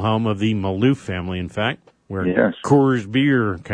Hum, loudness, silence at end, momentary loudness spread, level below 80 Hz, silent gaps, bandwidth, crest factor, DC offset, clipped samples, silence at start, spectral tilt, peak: none; -20 LUFS; 0 s; 10 LU; -50 dBFS; none; 10 kHz; 18 dB; under 0.1%; under 0.1%; 0 s; -7 dB/octave; -2 dBFS